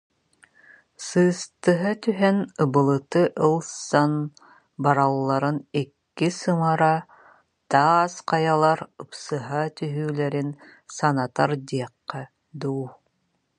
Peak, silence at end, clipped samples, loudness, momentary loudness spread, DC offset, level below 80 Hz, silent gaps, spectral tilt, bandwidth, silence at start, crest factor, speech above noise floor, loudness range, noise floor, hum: -2 dBFS; 0.65 s; under 0.1%; -23 LUFS; 14 LU; under 0.1%; -70 dBFS; none; -6 dB/octave; 11 kHz; 1 s; 22 dB; 50 dB; 5 LU; -72 dBFS; none